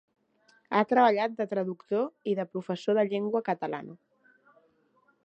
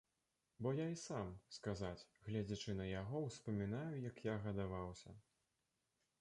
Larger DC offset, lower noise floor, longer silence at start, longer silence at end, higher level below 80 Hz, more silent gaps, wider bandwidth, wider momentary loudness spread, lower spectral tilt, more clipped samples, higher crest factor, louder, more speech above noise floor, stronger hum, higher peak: neither; second, -68 dBFS vs -88 dBFS; about the same, 0.7 s vs 0.6 s; first, 1.3 s vs 1 s; second, -82 dBFS vs -66 dBFS; neither; second, 8.2 kHz vs 11 kHz; first, 11 LU vs 7 LU; about the same, -7 dB/octave vs -6.5 dB/octave; neither; about the same, 22 dB vs 18 dB; first, -28 LUFS vs -46 LUFS; about the same, 40 dB vs 43 dB; neither; first, -8 dBFS vs -30 dBFS